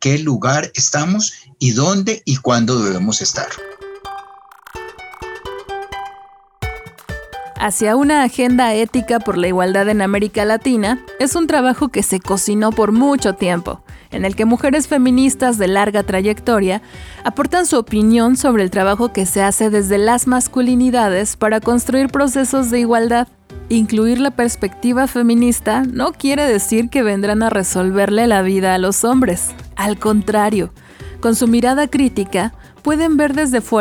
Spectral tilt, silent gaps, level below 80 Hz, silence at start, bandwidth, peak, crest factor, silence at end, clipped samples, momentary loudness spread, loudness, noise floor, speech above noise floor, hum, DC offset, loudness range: -4.5 dB/octave; none; -40 dBFS; 0 s; 18.5 kHz; -2 dBFS; 12 dB; 0 s; under 0.1%; 14 LU; -15 LUFS; -42 dBFS; 28 dB; none; under 0.1%; 5 LU